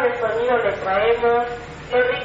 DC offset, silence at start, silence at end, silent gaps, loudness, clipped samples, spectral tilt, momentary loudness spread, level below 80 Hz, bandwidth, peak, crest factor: under 0.1%; 0 s; 0 s; none; -20 LUFS; under 0.1%; -2 dB/octave; 6 LU; -46 dBFS; 7.8 kHz; -6 dBFS; 14 dB